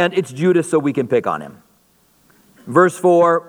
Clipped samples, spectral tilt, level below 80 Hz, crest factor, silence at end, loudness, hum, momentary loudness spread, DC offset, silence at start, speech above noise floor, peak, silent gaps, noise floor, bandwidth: under 0.1%; -6 dB/octave; -66 dBFS; 16 dB; 0.05 s; -16 LUFS; none; 10 LU; under 0.1%; 0 s; 41 dB; 0 dBFS; none; -57 dBFS; 13 kHz